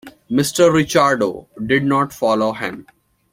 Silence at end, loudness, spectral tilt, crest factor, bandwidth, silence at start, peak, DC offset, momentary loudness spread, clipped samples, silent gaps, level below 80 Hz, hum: 0.5 s; -17 LUFS; -5 dB/octave; 16 dB; 16.5 kHz; 0.05 s; -2 dBFS; under 0.1%; 13 LU; under 0.1%; none; -52 dBFS; none